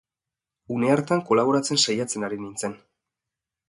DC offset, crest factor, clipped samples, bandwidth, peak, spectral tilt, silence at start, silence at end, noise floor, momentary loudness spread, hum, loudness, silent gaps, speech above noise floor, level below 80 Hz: under 0.1%; 20 dB; under 0.1%; 11.5 kHz; -6 dBFS; -4 dB/octave; 0.7 s; 0.9 s; -89 dBFS; 11 LU; none; -23 LUFS; none; 66 dB; -68 dBFS